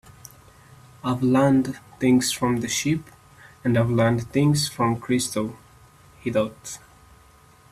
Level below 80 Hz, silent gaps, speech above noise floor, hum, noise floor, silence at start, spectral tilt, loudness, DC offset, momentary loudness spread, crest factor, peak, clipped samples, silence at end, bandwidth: -54 dBFS; none; 31 dB; none; -53 dBFS; 1.05 s; -5.5 dB/octave; -23 LUFS; under 0.1%; 12 LU; 16 dB; -8 dBFS; under 0.1%; 0.95 s; 14.5 kHz